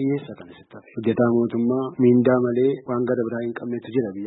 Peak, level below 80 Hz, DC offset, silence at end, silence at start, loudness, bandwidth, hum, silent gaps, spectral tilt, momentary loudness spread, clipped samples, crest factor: -6 dBFS; -62 dBFS; under 0.1%; 0 s; 0 s; -22 LUFS; 4 kHz; none; none; -12.5 dB/octave; 12 LU; under 0.1%; 16 dB